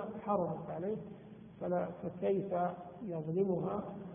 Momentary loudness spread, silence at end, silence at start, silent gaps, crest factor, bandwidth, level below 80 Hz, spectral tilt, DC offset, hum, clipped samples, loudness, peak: 10 LU; 0 s; 0 s; none; 18 dB; 3.6 kHz; -70 dBFS; -6.5 dB/octave; under 0.1%; none; under 0.1%; -37 LUFS; -20 dBFS